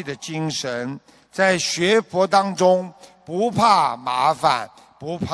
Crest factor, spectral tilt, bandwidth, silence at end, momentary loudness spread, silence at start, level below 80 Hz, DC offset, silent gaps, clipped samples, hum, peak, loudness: 18 dB; -4 dB/octave; 11 kHz; 0 s; 16 LU; 0 s; -58 dBFS; under 0.1%; none; under 0.1%; none; -2 dBFS; -20 LUFS